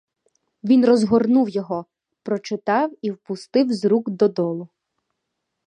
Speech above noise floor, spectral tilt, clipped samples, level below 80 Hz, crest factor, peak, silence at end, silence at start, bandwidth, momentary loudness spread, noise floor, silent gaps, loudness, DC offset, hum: 59 dB; -7 dB/octave; under 0.1%; -64 dBFS; 18 dB; -4 dBFS; 1 s; 0.65 s; 9.8 kHz; 14 LU; -78 dBFS; none; -20 LUFS; under 0.1%; none